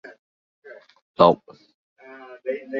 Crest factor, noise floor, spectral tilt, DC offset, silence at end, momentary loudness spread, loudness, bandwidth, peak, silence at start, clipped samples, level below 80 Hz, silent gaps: 24 dB; -44 dBFS; -8 dB/octave; under 0.1%; 0 s; 25 LU; -21 LUFS; 6.4 kHz; -2 dBFS; 0.7 s; under 0.1%; -62 dBFS; 1.02-1.14 s, 1.74-1.96 s